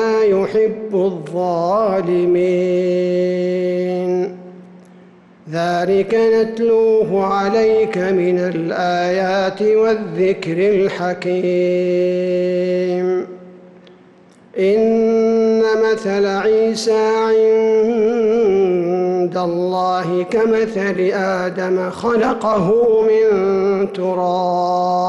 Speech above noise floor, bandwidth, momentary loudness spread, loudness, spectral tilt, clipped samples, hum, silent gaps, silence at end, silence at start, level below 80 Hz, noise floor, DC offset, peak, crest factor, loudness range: 31 dB; 11.5 kHz; 5 LU; -16 LUFS; -6.5 dB/octave; under 0.1%; none; none; 0 s; 0 s; -56 dBFS; -46 dBFS; under 0.1%; -8 dBFS; 8 dB; 4 LU